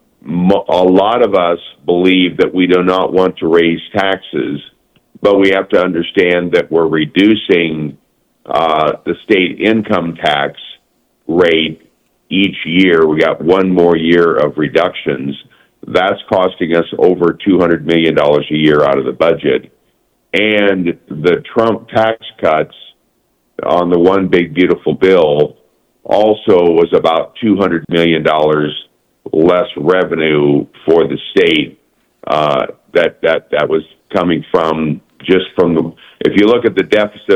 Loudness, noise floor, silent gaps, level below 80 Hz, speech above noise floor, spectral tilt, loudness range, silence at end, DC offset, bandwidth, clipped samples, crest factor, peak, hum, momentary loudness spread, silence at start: -12 LUFS; -60 dBFS; none; -50 dBFS; 48 dB; -7 dB/octave; 3 LU; 0 s; under 0.1%; 8.8 kHz; 0.1%; 12 dB; 0 dBFS; none; 8 LU; 0.25 s